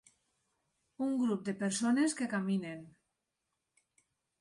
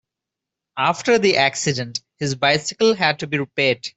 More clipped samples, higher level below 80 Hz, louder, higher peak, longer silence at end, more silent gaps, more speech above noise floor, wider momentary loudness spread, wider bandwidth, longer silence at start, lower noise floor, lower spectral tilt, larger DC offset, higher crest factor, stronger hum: neither; second, -80 dBFS vs -60 dBFS; second, -34 LUFS vs -19 LUFS; second, -22 dBFS vs -4 dBFS; first, 1.5 s vs 0.05 s; neither; second, 53 dB vs 66 dB; about the same, 8 LU vs 10 LU; first, 11.5 kHz vs 8.4 kHz; first, 1 s vs 0.75 s; about the same, -86 dBFS vs -85 dBFS; first, -5 dB/octave vs -3.5 dB/octave; neither; about the same, 16 dB vs 18 dB; neither